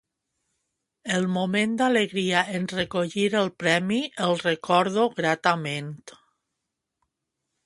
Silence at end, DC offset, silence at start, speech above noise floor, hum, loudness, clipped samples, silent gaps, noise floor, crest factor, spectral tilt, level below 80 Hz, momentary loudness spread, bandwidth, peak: 1.55 s; under 0.1%; 1.05 s; 59 dB; none; -24 LUFS; under 0.1%; none; -83 dBFS; 22 dB; -5 dB/octave; -66 dBFS; 6 LU; 11.5 kHz; -4 dBFS